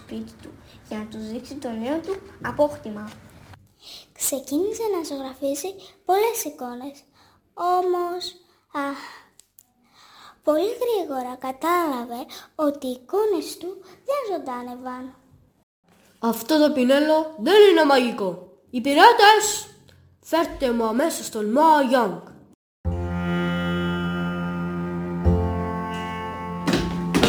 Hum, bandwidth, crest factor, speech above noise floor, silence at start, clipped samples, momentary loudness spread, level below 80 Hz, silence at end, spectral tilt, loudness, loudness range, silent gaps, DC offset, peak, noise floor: none; over 20 kHz; 22 dB; 36 dB; 0 s; under 0.1%; 18 LU; -44 dBFS; 0 s; -4.5 dB/octave; -22 LUFS; 11 LU; 15.63-15.83 s, 22.55-22.84 s; under 0.1%; 0 dBFS; -58 dBFS